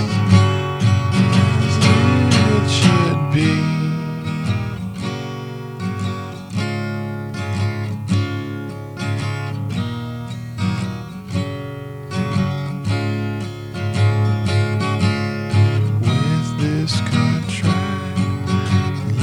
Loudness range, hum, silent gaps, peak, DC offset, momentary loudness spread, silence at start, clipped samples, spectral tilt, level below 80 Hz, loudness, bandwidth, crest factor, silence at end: 9 LU; none; none; 0 dBFS; under 0.1%; 13 LU; 0 s; under 0.1%; -6 dB/octave; -46 dBFS; -19 LUFS; 11.5 kHz; 18 dB; 0 s